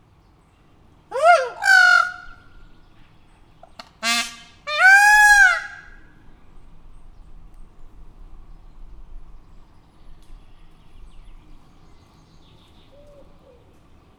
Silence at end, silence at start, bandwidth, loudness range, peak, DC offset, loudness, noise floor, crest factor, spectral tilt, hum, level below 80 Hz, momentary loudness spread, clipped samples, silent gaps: 3.85 s; 1.1 s; over 20 kHz; 4 LU; -2 dBFS; under 0.1%; -14 LUFS; -54 dBFS; 20 dB; 0 dB/octave; none; -44 dBFS; 21 LU; under 0.1%; none